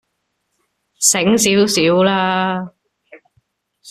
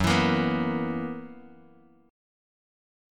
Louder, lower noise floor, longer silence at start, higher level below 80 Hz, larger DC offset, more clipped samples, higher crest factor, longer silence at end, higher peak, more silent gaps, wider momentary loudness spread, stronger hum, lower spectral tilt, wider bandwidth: first, -14 LUFS vs -27 LUFS; first, -71 dBFS vs -57 dBFS; first, 1 s vs 0 s; about the same, -56 dBFS vs -52 dBFS; neither; neither; about the same, 18 dB vs 20 dB; second, 0 s vs 1.65 s; first, 0 dBFS vs -8 dBFS; neither; second, 9 LU vs 17 LU; neither; second, -3 dB/octave vs -5.5 dB/octave; second, 14.5 kHz vs 17 kHz